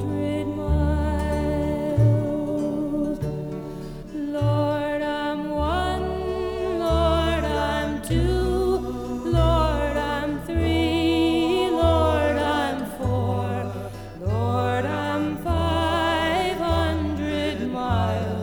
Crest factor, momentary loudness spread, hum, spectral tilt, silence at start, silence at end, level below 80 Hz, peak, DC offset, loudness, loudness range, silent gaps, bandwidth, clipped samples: 16 dB; 7 LU; none; -7 dB/octave; 0 s; 0 s; -32 dBFS; -6 dBFS; 0.1%; -24 LUFS; 4 LU; none; 20 kHz; under 0.1%